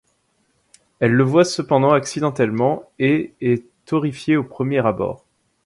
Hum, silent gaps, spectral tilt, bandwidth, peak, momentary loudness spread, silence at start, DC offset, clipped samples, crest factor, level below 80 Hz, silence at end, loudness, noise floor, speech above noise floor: none; none; -6.5 dB/octave; 11.5 kHz; -2 dBFS; 8 LU; 1 s; under 0.1%; under 0.1%; 18 dB; -56 dBFS; 0.5 s; -19 LUFS; -65 dBFS; 47 dB